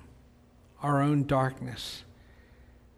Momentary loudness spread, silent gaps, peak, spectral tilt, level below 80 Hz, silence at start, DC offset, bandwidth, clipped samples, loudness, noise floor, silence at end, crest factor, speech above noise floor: 13 LU; none; -14 dBFS; -7 dB/octave; -56 dBFS; 0.8 s; under 0.1%; 13.5 kHz; under 0.1%; -29 LUFS; -58 dBFS; 0.95 s; 18 dB; 30 dB